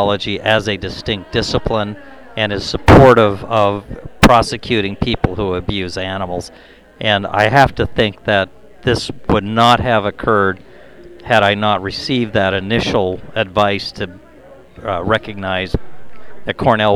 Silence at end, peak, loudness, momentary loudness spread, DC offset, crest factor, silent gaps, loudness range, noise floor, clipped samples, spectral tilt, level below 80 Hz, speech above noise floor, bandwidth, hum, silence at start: 0 s; 0 dBFS; -15 LUFS; 14 LU; under 0.1%; 16 dB; none; 6 LU; -42 dBFS; under 0.1%; -5.5 dB/octave; -32 dBFS; 27 dB; over 20 kHz; none; 0 s